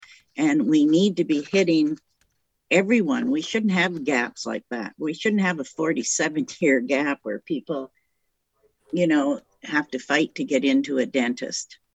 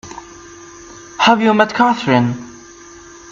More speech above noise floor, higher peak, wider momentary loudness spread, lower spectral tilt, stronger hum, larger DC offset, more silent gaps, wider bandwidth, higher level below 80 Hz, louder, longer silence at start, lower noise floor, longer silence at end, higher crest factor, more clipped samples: first, 53 dB vs 26 dB; second, -6 dBFS vs 0 dBFS; second, 11 LU vs 24 LU; about the same, -4.5 dB/octave vs -5 dB/octave; neither; neither; neither; first, 8.6 kHz vs 7.6 kHz; second, -70 dBFS vs -54 dBFS; second, -23 LUFS vs -14 LUFS; first, 0.35 s vs 0.05 s; first, -75 dBFS vs -39 dBFS; second, 0.3 s vs 0.75 s; about the same, 18 dB vs 18 dB; neither